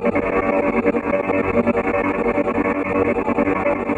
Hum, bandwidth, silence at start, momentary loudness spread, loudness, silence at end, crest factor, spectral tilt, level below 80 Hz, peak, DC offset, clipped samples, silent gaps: none; 9.2 kHz; 0 s; 2 LU; -19 LUFS; 0 s; 14 dB; -8.5 dB/octave; -42 dBFS; -4 dBFS; under 0.1%; under 0.1%; none